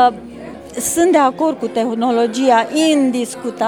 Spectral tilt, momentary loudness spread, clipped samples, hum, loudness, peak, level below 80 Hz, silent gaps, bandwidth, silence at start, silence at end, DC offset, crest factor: -3 dB/octave; 15 LU; under 0.1%; none; -15 LUFS; 0 dBFS; -54 dBFS; none; 20 kHz; 0 s; 0 s; under 0.1%; 16 dB